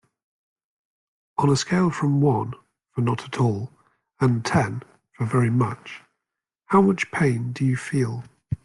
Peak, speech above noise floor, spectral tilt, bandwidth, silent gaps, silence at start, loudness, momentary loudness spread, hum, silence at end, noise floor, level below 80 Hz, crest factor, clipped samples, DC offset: -6 dBFS; 64 dB; -6.5 dB/octave; 11.5 kHz; none; 1.4 s; -23 LUFS; 15 LU; none; 0.1 s; -85 dBFS; -58 dBFS; 18 dB; under 0.1%; under 0.1%